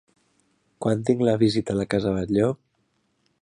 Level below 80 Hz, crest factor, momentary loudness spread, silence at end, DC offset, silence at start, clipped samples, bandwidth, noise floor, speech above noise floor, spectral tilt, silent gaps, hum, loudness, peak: -52 dBFS; 18 dB; 6 LU; 0.85 s; under 0.1%; 0.8 s; under 0.1%; 11 kHz; -70 dBFS; 48 dB; -7 dB/octave; none; none; -23 LUFS; -6 dBFS